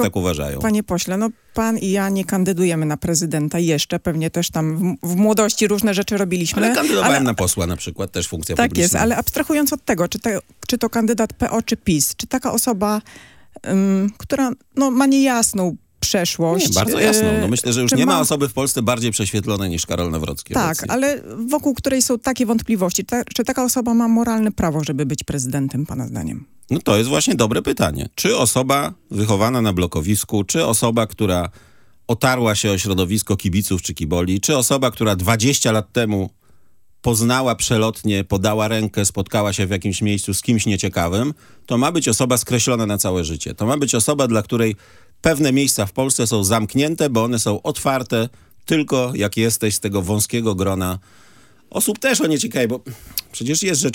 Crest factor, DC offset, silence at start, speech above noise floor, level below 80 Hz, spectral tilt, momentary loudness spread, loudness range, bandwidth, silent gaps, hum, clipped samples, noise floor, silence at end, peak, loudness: 18 dB; under 0.1%; 0 s; 42 dB; -44 dBFS; -4.5 dB/octave; 7 LU; 3 LU; 17 kHz; none; none; under 0.1%; -61 dBFS; 0 s; 0 dBFS; -18 LUFS